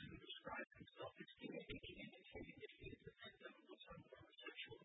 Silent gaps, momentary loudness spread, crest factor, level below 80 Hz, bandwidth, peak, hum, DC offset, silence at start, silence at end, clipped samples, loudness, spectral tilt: none; 8 LU; 20 dB; -74 dBFS; 3.9 kHz; -38 dBFS; none; under 0.1%; 0 s; 0 s; under 0.1%; -57 LUFS; -2.5 dB/octave